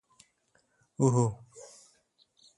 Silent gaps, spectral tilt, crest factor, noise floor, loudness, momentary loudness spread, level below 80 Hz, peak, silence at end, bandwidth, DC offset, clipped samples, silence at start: none; -7.5 dB/octave; 22 dB; -72 dBFS; -28 LUFS; 25 LU; -64 dBFS; -12 dBFS; 0.95 s; 11.5 kHz; under 0.1%; under 0.1%; 1 s